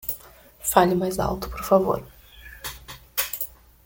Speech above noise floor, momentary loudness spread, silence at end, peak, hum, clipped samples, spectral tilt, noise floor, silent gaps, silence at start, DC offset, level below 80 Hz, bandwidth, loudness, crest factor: 26 dB; 16 LU; 0.35 s; -2 dBFS; none; under 0.1%; -4.5 dB/octave; -47 dBFS; none; 0.05 s; under 0.1%; -44 dBFS; 17 kHz; -24 LUFS; 24 dB